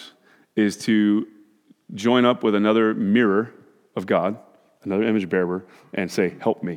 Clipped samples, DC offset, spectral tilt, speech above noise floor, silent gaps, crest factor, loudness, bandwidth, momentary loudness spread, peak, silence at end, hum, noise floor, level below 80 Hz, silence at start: under 0.1%; under 0.1%; -6 dB/octave; 35 dB; none; 20 dB; -21 LUFS; 13.5 kHz; 15 LU; -2 dBFS; 0 s; none; -56 dBFS; -72 dBFS; 0 s